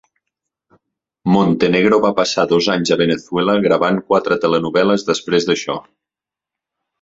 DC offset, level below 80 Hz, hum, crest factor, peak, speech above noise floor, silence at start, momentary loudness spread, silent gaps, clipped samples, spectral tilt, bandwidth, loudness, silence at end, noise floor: under 0.1%; -54 dBFS; none; 16 dB; -2 dBFS; 72 dB; 1.25 s; 5 LU; none; under 0.1%; -5 dB/octave; 8 kHz; -16 LUFS; 1.2 s; -87 dBFS